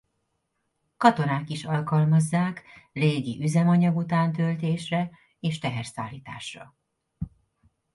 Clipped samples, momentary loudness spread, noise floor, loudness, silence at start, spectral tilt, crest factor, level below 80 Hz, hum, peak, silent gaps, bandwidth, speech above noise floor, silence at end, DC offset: under 0.1%; 18 LU; -76 dBFS; -25 LUFS; 1 s; -7 dB/octave; 22 dB; -58 dBFS; none; -4 dBFS; none; 11.5 kHz; 52 dB; 0.65 s; under 0.1%